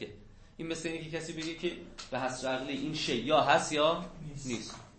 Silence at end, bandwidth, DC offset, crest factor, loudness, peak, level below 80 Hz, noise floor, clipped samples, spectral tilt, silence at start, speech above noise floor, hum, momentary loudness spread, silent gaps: 0 s; 8.8 kHz; under 0.1%; 22 dB; -32 LUFS; -12 dBFS; -56 dBFS; -53 dBFS; under 0.1%; -4 dB/octave; 0 s; 20 dB; none; 15 LU; none